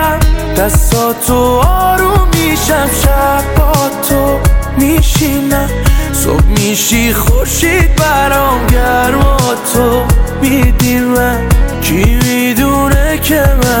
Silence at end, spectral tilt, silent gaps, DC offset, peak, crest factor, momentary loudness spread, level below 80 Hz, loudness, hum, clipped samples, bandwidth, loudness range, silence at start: 0 s; -4.5 dB/octave; none; under 0.1%; 0 dBFS; 10 dB; 3 LU; -14 dBFS; -10 LUFS; none; under 0.1%; 17 kHz; 1 LU; 0 s